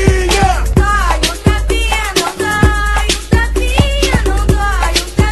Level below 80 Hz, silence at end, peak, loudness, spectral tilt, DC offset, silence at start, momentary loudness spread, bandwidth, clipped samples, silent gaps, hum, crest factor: -16 dBFS; 0 s; 0 dBFS; -13 LUFS; -4.5 dB/octave; under 0.1%; 0 s; 3 LU; 13 kHz; under 0.1%; none; none; 12 dB